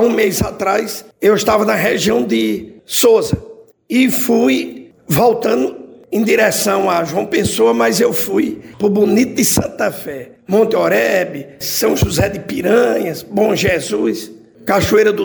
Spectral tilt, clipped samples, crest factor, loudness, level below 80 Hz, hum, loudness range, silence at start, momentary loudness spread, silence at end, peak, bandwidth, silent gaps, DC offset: -4.5 dB/octave; under 0.1%; 14 dB; -15 LUFS; -40 dBFS; none; 1 LU; 0 s; 10 LU; 0 s; -2 dBFS; over 20 kHz; none; under 0.1%